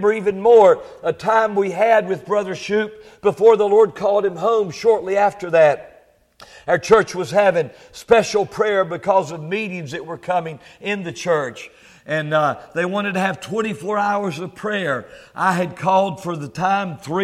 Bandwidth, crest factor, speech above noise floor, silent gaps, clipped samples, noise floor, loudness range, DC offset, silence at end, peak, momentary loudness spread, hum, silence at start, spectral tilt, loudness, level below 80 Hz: 13 kHz; 18 dB; 34 dB; none; under 0.1%; -52 dBFS; 6 LU; under 0.1%; 0 s; 0 dBFS; 13 LU; none; 0 s; -5.5 dB/octave; -18 LUFS; -58 dBFS